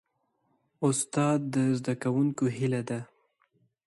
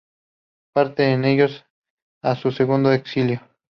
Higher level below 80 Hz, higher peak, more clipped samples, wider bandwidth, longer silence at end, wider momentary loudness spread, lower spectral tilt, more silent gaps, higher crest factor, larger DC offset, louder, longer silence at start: second, -70 dBFS vs -62 dBFS; second, -14 dBFS vs -4 dBFS; neither; first, 11.5 kHz vs 6.4 kHz; first, 0.8 s vs 0.3 s; about the same, 5 LU vs 7 LU; second, -6 dB/octave vs -8.5 dB/octave; second, none vs 1.70-1.82 s, 1.90-2.21 s; about the same, 16 dB vs 16 dB; neither; second, -29 LUFS vs -20 LUFS; about the same, 0.8 s vs 0.75 s